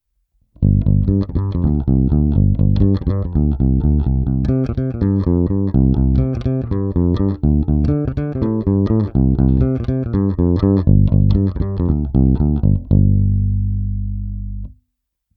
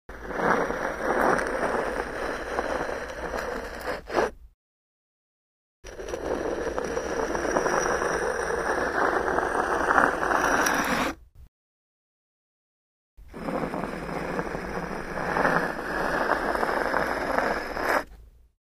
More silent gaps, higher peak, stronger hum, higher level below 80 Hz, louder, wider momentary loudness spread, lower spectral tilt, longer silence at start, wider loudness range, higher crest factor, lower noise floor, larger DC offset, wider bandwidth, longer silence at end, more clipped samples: second, none vs 4.54-5.83 s, 11.48-13.17 s; about the same, 0 dBFS vs -2 dBFS; first, 50 Hz at -35 dBFS vs none; first, -22 dBFS vs -46 dBFS; first, -17 LUFS vs -27 LUFS; second, 6 LU vs 10 LU; first, -12 dB/octave vs -4 dB/octave; first, 0.6 s vs 0.1 s; second, 2 LU vs 9 LU; second, 16 dB vs 26 dB; first, -73 dBFS vs -49 dBFS; neither; second, 4.6 kHz vs 15.5 kHz; first, 0.65 s vs 0.45 s; neither